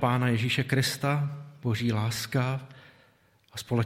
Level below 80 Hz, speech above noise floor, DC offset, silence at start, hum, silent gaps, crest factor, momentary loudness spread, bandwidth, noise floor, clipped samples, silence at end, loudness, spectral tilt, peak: -64 dBFS; 36 dB; under 0.1%; 0 s; none; none; 20 dB; 12 LU; 16 kHz; -63 dBFS; under 0.1%; 0 s; -28 LUFS; -5.5 dB/octave; -8 dBFS